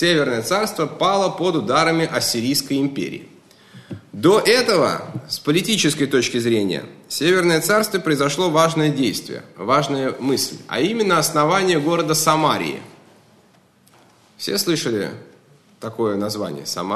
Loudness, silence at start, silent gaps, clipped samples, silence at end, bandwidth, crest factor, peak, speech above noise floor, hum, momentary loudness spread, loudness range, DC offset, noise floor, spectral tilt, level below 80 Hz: -19 LUFS; 0 s; none; under 0.1%; 0 s; 13 kHz; 18 dB; 0 dBFS; 35 dB; none; 12 LU; 6 LU; 0.1%; -54 dBFS; -4 dB/octave; -62 dBFS